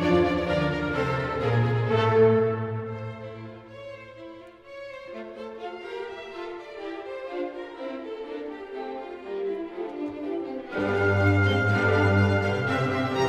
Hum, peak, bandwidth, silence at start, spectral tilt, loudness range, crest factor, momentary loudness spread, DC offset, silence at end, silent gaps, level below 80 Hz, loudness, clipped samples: none; -10 dBFS; 9 kHz; 0 s; -7.5 dB/octave; 15 LU; 16 dB; 19 LU; under 0.1%; 0 s; none; -52 dBFS; -26 LUFS; under 0.1%